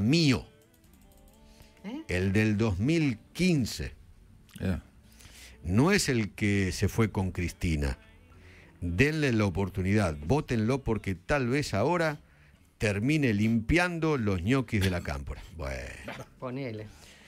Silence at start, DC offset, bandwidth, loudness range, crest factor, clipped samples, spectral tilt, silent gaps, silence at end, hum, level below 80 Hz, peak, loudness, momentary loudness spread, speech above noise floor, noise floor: 0 s; under 0.1%; 16 kHz; 2 LU; 20 dB; under 0.1%; -6 dB/octave; none; 0.15 s; none; -44 dBFS; -10 dBFS; -29 LUFS; 15 LU; 31 dB; -59 dBFS